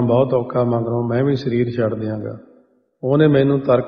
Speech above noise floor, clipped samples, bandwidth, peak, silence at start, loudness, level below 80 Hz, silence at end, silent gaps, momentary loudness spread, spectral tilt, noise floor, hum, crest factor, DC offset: 38 dB; under 0.1%; 6.4 kHz; -2 dBFS; 0 s; -18 LUFS; -54 dBFS; 0 s; none; 13 LU; -10 dB/octave; -55 dBFS; none; 16 dB; under 0.1%